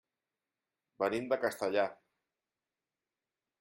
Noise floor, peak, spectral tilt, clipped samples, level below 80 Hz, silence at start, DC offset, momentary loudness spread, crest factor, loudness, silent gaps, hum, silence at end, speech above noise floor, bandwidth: under -90 dBFS; -18 dBFS; -4.5 dB/octave; under 0.1%; -82 dBFS; 1 s; under 0.1%; 4 LU; 22 dB; -34 LUFS; none; none; 1.65 s; over 57 dB; 14.5 kHz